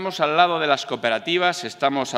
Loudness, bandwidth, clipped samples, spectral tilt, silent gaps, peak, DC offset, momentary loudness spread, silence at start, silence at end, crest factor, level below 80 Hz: -21 LUFS; 14.5 kHz; under 0.1%; -3.5 dB/octave; none; -2 dBFS; under 0.1%; 5 LU; 0 s; 0 s; 18 dB; -74 dBFS